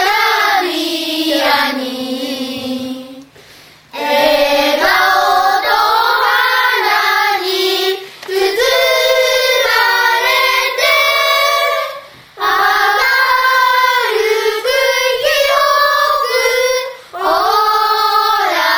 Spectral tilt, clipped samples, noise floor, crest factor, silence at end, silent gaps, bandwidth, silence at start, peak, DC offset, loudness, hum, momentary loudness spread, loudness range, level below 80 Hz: -0.5 dB/octave; under 0.1%; -41 dBFS; 14 dB; 0 s; none; over 20 kHz; 0 s; 0 dBFS; under 0.1%; -12 LUFS; none; 9 LU; 5 LU; -50 dBFS